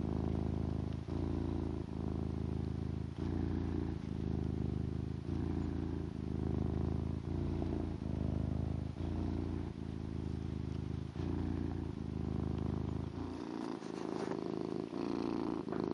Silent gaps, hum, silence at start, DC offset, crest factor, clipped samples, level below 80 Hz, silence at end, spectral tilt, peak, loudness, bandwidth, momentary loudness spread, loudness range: none; none; 0 s; under 0.1%; 14 dB; under 0.1%; -48 dBFS; 0 s; -9 dB/octave; -24 dBFS; -40 LUFS; 10.5 kHz; 4 LU; 2 LU